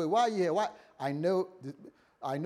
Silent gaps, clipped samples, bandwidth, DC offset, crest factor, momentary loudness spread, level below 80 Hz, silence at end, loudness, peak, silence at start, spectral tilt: none; under 0.1%; 13 kHz; under 0.1%; 16 dB; 18 LU; -84 dBFS; 0 s; -32 LUFS; -16 dBFS; 0 s; -6 dB/octave